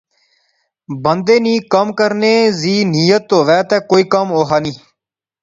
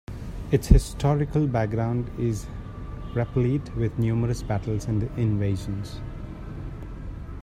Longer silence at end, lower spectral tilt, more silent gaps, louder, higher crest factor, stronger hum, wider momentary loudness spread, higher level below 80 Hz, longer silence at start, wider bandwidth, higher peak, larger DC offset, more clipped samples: first, 0.65 s vs 0 s; second, -5.5 dB/octave vs -7.5 dB/octave; neither; first, -13 LUFS vs -26 LUFS; second, 14 dB vs 24 dB; neither; second, 5 LU vs 16 LU; second, -56 dBFS vs -32 dBFS; first, 0.9 s vs 0.1 s; second, 7.8 kHz vs 14.5 kHz; about the same, 0 dBFS vs 0 dBFS; neither; neither